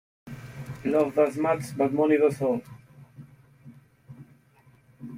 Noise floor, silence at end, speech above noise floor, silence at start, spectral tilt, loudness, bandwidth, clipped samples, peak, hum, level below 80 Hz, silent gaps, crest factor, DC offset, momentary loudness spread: -59 dBFS; 0 s; 35 dB; 0.25 s; -7.5 dB/octave; -25 LUFS; 16 kHz; under 0.1%; -10 dBFS; none; -64 dBFS; none; 18 dB; under 0.1%; 21 LU